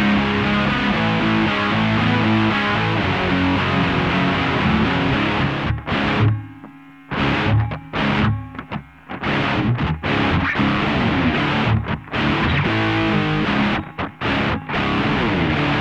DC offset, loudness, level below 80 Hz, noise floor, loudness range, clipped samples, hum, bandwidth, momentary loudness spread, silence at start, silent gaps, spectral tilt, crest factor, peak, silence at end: 0.2%; -19 LUFS; -36 dBFS; -41 dBFS; 3 LU; under 0.1%; none; 8.2 kHz; 5 LU; 0 s; none; -7 dB/octave; 12 dB; -6 dBFS; 0 s